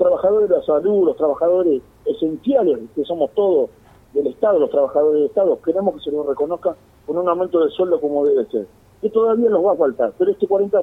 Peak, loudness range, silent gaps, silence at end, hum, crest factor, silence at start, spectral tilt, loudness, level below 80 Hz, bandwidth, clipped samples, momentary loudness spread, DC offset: -4 dBFS; 2 LU; none; 0 s; none; 14 dB; 0 s; -8.5 dB/octave; -18 LUFS; -56 dBFS; 4 kHz; under 0.1%; 8 LU; under 0.1%